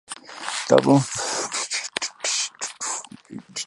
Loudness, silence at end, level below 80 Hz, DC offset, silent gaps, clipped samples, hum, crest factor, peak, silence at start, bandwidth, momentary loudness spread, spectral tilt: -23 LUFS; 0 s; -68 dBFS; under 0.1%; none; under 0.1%; none; 22 dB; -2 dBFS; 0.1 s; 11.5 kHz; 16 LU; -3.5 dB/octave